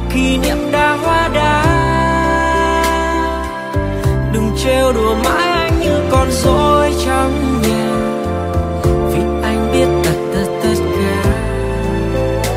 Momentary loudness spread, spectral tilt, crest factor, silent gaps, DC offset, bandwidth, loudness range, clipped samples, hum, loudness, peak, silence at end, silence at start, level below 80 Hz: 5 LU; -5.5 dB/octave; 14 dB; none; under 0.1%; 16 kHz; 2 LU; under 0.1%; none; -15 LUFS; 0 dBFS; 0 s; 0 s; -24 dBFS